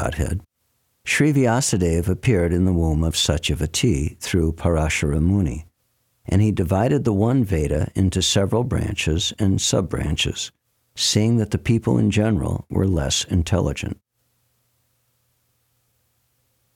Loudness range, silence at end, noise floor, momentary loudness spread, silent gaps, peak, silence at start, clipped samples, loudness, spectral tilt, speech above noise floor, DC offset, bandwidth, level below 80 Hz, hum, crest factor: 5 LU; 2.8 s; -69 dBFS; 7 LU; none; -6 dBFS; 0 s; under 0.1%; -20 LUFS; -5 dB/octave; 49 dB; under 0.1%; 16.5 kHz; -34 dBFS; none; 16 dB